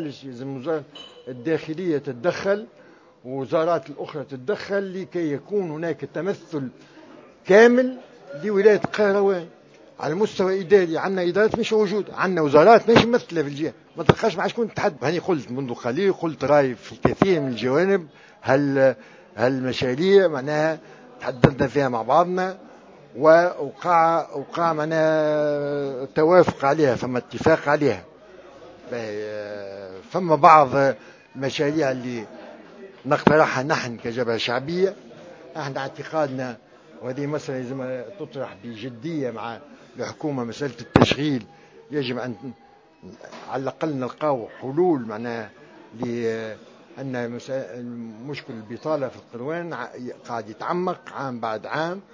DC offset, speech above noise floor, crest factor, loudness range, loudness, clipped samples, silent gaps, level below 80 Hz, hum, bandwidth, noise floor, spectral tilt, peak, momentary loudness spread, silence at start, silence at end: under 0.1%; 24 dB; 22 dB; 11 LU; -22 LUFS; under 0.1%; none; -54 dBFS; none; 7.6 kHz; -46 dBFS; -6.5 dB/octave; 0 dBFS; 17 LU; 0 s; 0.1 s